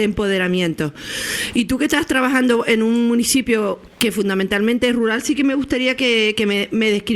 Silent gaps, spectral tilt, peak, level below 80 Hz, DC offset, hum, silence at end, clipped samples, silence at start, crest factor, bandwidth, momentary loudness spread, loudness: none; -4 dB/octave; 0 dBFS; -46 dBFS; under 0.1%; none; 0 s; under 0.1%; 0 s; 18 dB; over 20 kHz; 5 LU; -18 LUFS